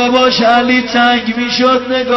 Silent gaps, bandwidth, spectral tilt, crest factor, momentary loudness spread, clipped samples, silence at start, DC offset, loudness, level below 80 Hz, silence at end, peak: none; 6.2 kHz; -4 dB/octave; 10 dB; 4 LU; under 0.1%; 0 s; 0.2%; -11 LUFS; -48 dBFS; 0 s; 0 dBFS